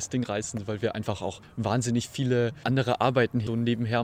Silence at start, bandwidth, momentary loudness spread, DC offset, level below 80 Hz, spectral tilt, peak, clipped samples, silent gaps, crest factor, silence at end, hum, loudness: 0 s; 14.5 kHz; 8 LU; under 0.1%; -58 dBFS; -5.5 dB/octave; -8 dBFS; under 0.1%; none; 18 dB; 0 s; none; -28 LUFS